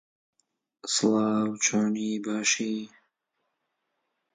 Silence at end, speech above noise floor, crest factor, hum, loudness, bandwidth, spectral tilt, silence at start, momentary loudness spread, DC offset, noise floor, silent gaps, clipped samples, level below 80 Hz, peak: 1.45 s; 54 dB; 18 dB; none; -26 LUFS; 9.6 kHz; -3 dB/octave; 0.85 s; 11 LU; under 0.1%; -80 dBFS; none; under 0.1%; -76 dBFS; -12 dBFS